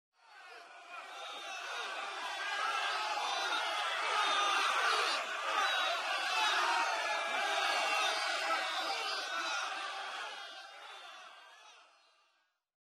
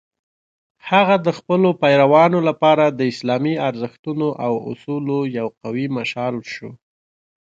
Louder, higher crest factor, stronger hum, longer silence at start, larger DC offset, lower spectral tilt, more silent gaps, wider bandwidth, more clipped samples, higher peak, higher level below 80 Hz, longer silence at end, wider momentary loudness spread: second, -33 LUFS vs -18 LUFS; about the same, 16 dB vs 18 dB; neither; second, 0.3 s vs 0.85 s; neither; second, 2.5 dB/octave vs -7 dB/octave; second, none vs 3.99-4.03 s; first, 15.5 kHz vs 7.8 kHz; neither; second, -20 dBFS vs 0 dBFS; second, under -90 dBFS vs -66 dBFS; first, 1.1 s vs 0.7 s; first, 18 LU vs 13 LU